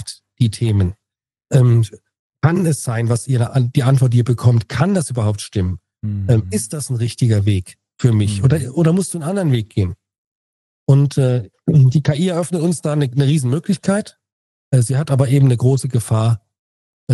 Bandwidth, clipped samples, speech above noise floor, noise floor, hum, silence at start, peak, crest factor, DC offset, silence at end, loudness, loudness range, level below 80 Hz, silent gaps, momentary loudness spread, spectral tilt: 12.5 kHz; under 0.1%; 69 dB; -85 dBFS; none; 0 s; 0 dBFS; 16 dB; under 0.1%; 0 s; -17 LUFS; 2 LU; -48 dBFS; 2.19-2.30 s, 10.18-10.87 s, 14.32-14.71 s, 16.59-17.07 s; 8 LU; -7 dB/octave